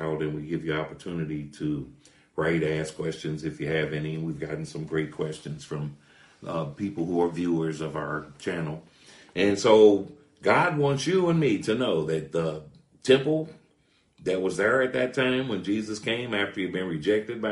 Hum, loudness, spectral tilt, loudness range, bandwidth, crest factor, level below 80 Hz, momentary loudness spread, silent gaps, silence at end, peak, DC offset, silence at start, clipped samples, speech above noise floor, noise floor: none; -27 LUFS; -6 dB/octave; 9 LU; 11.5 kHz; 22 dB; -58 dBFS; 13 LU; none; 0 s; -4 dBFS; under 0.1%; 0 s; under 0.1%; 40 dB; -66 dBFS